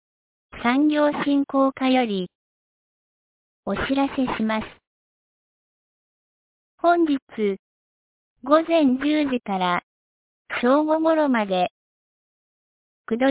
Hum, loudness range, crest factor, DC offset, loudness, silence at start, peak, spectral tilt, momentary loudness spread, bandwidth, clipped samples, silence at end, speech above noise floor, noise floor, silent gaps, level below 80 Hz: none; 7 LU; 20 dB; under 0.1%; -22 LUFS; 0.55 s; -4 dBFS; -9.5 dB/octave; 10 LU; 4 kHz; under 0.1%; 0 s; over 69 dB; under -90 dBFS; 2.35-3.63 s, 4.87-6.78 s, 7.22-7.27 s, 7.59-8.36 s, 9.83-10.45 s, 11.71-13.04 s; -56 dBFS